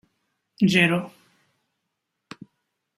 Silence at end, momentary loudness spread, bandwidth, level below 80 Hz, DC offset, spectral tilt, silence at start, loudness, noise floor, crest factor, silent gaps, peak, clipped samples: 1.9 s; 26 LU; 15.5 kHz; -66 dBFS; under 0.1%; -5.5 dB/octave; 0.6 s; -21 LUFS; -80 dBFS; 22 dB; none; -4 dBFS; under 0.1%